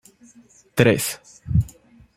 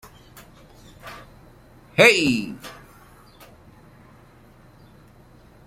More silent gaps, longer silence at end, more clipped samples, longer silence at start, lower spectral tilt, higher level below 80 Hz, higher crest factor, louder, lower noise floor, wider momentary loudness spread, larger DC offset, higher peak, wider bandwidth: neither; second, 0.5 s vs 2.95 s; neither; second, 0.75 s vs 1.05 s; first, -5.5 dB/octave vs -3.5 dB/octave; first, -40 dBFS vs -54 dBFS; about the same, 22 dB vs 26 dB; second, -21 LUFS vs -18 LUFS; about the same, -52 dBFS vs -50 dBFS; second, 15 LU vs 28 LU; neither; about the same, -2 dBFS vs 0 dBFS; about the same, 16.5 kHz vs 16.5 kHz